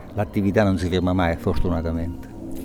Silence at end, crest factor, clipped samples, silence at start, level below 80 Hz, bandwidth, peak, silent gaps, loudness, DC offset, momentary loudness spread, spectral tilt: 0 s; 18 dB; under 0.1%; 0 s; -34 dBFS; 16.5 kHz; -4 dBFS; none; -22 LUFS; under 0.1%; 12 LU; -7.5 dB/octave